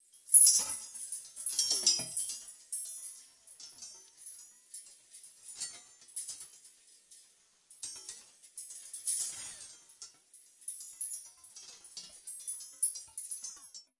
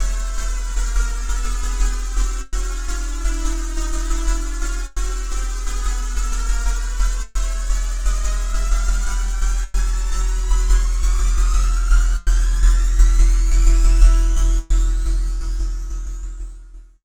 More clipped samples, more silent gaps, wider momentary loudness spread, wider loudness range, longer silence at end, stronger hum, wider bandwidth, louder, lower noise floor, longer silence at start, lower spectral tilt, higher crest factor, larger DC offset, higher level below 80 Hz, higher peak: neither; neither; first, 23 LU vs 9 LU; first, 13 LU vs 7 LU; about the same, 0.2 s vs 0.2 s; neither; about the same, 12 kHz vs 11 kHz; second, -30 LUFS vs -22 LUFS; first, -66 dBFS vs -38 dBFS; first, 0.15 s vs 0 s; second, 2.5 dB/octave vs -4 dB/octave; first, 28 dB vs 16 dB; neither; second, -82 dBFS vs -16 dBFS; second, -8 dBFS vs -2 dBFS